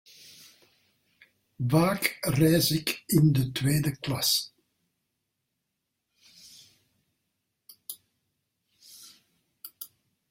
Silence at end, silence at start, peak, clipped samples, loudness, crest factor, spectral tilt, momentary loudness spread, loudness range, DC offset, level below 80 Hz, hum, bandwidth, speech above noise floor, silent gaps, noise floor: 0.45 s; 1.6 s; -8 dBFS; under 0.1%; -25 LUFS; 22 dB; -5 dB/octave; 24 LU; 23 LU; under 0.1%; -60 dBFS; none; 16.5 kHz; 57 dB; none; -82 dBFS